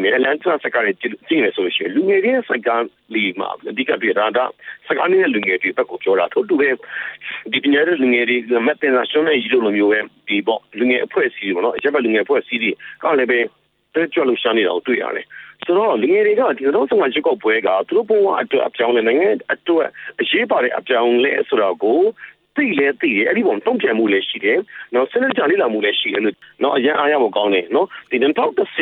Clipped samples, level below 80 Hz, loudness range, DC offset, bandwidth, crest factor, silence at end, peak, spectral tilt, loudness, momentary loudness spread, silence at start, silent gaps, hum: under 0.1%; -68 dBFS; 2 LU; under 0.1%; 4.2 kHz; 14 dB; 0 s; -4 dBFS; -7.5 dB/octave; -17 LUFS; 6 LU; 0 s; none; none